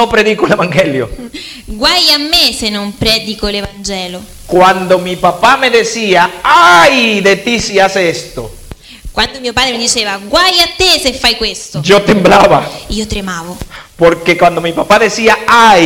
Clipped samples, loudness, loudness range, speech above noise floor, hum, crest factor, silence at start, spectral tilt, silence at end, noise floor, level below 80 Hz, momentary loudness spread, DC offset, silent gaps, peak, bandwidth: 0.2%; -9 LUFS; 4 LU; 21 dB; none; 10 dB; 0 s; -3 dB/octave; 0 s; -31 dBFS; -32 dBFS; 15 LU; under 0.1%; none; 0 dBFS; 17.5 kHz